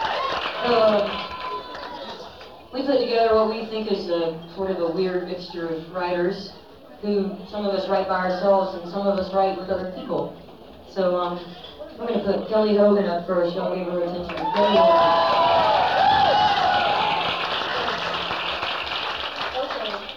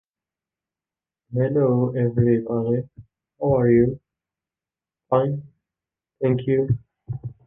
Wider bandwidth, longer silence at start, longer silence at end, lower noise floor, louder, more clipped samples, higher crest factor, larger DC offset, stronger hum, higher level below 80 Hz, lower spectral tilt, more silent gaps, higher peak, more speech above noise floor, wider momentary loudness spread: first, 12 kHz vs 3.6 kHz; second, 0 s vs 1.3 s; second, 0 s vs 0.15 s; second, -43 dBFS vs under -90 dBFS; about the same, -22 LUFS vs -22 LUFS; neither; about the same, 16 dB vs 18 dB; first, 0.2% vs under 0.1%; neither; about the same, -54 dBFS vs -52 dBFS; second, -6 dB/octave vs -12.5 dB/octave; neither; about the same, -8 dBFS vs -6 dBFS; second, 21 dB vs over 70 dB; about the same, 15 LU vs 15 LU